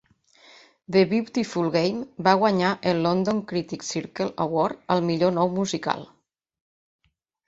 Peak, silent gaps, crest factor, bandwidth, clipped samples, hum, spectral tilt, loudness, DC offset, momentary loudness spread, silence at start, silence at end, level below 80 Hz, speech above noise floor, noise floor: -2 dBFS; none; 22 dB; 8 kHz; under 0.1%; none; -5.5 dB/octave; -24 LUFS; under 0.1%; 9 LU; 0.9 s; 1.4 s; -62 dBFS; 33 dB; -56 dBFS